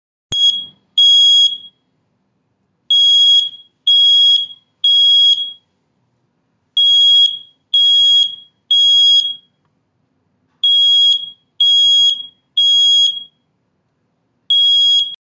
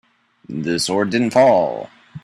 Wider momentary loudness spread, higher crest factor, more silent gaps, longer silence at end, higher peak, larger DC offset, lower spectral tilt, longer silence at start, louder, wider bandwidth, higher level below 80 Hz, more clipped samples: second, 14 LU vs 18 LU; second, 10 dB vs 16 dB; neither; about the same, 0.05 s vs 0.05 s; about the same, -4 dBFS vs -2 dBFS; neither; second, 2.5 dB/octave vs -4.5 dB/octave; second, 0.3 s vs 0.5 s; first, -9 LUFS vs -17 LUFS; second, 7.6 kHz vs 13 kHz; about the same, -64 dBFS vs -60 dBFS; neither